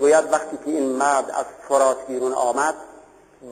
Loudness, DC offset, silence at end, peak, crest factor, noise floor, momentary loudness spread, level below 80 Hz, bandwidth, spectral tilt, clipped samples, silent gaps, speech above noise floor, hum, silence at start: -21 LUFS; under 0.1%; 0 s; -6 dBFS; 16 dB; -48 dBFS; 9 LU; -64 dBFS; 15.5 kHz; -3 dB/octave; under 0.1%; none; 27 dB; none; 0 s